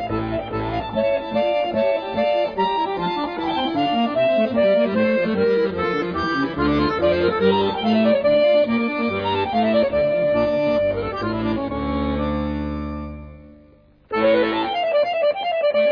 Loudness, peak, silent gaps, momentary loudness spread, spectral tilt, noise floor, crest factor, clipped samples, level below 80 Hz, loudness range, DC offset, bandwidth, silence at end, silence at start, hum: -20 LUFS; -6 dBFS; none; 7 LU; -8 dB/octave; -51 dBFS; 14 dB; under 0.1%; -40 dBFS; 5 LU; under 0.1%; 5.4 kHz; 0 s; 0 s; none